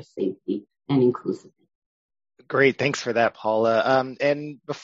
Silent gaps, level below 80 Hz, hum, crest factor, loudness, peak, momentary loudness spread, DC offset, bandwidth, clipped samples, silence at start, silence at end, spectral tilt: 1.75-2.09 s; -68 dBFS; none; 20 dB; -23 LUFS; -4 dBFS; 12 LU; under 0.1%; 7.8 kHz; under 0.1%; 0 s; 0 s; -5.5 dB/octave